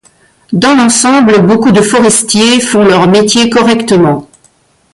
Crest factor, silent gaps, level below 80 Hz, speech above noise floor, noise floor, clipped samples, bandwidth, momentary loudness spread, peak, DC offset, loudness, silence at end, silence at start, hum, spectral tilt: 8 dB; none; -44 dBFS; 42 dB; -49 dBFS; under 0.1%; 11.5 kHz; 3 LU; 0 dBFS; under 0.1%; -7 LUFS; 0.7 s; 0.5 s; none; -4 dB/octave